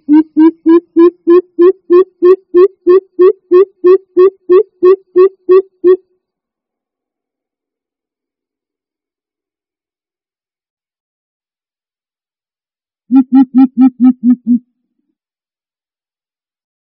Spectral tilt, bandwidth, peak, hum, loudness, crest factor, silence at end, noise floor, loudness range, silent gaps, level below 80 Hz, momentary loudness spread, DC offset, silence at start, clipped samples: -6.5 dB/octave; 4.9 kHz; 0 dBFS; none; -9 LUFS; 12 dB; 2.3 s; under -90 dBFS; 8 LU; 10.70-10.77 s, 11.00-11.40 s; -62 dBFS; 4 LU; under 0.1%; 0.1 s; under 0.1%